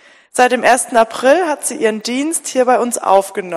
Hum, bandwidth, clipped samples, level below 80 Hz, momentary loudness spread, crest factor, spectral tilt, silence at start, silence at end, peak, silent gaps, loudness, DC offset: none; 15 kHz; 0.2%; -60 dBFS; 6 LU; 14 dB; -2 dB/octave; 0.35 s; 0 s; 0 dBFS; none; -14 LUFS; under 0.1%